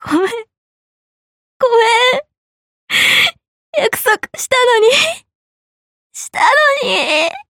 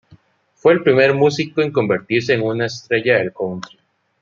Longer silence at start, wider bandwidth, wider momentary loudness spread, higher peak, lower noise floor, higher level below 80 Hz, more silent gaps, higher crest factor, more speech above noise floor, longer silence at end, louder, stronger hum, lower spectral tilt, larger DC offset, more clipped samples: second, 0 s vs 0.65 s; first, 17 kHz vs 7.4 kHz; about the same, 12 LU vs 12 LU; about the same, 0 dBFS vs 0 dBFS; first, under -90 dBFS vs -54 dBFS; about the same, -60 dBFS vs -60 dBFS; first, 0.58-1.60 s, 2.37-2.87 s, 3.48-3.73 s, 5.35-6.10 s vs none; about the same, 14 dB vs 16 dB; first, over 78 dB vs 37 dB; second, 0.1 s vs 0.55 s; first, -12 LUFS vs -17 LUFS; neither; second, -1 dB/octave vs -6 dB/octave; neither; neither